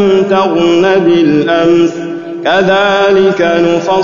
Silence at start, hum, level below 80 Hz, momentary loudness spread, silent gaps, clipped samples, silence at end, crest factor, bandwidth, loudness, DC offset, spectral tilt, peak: 0 s; none; -48 dBFS; 5 LU; none; under 0.1%; 0 s; 8 dB; 7.4 kHz; -9 LUFS; 0.7%; -6 dB/octave; 0 dBFS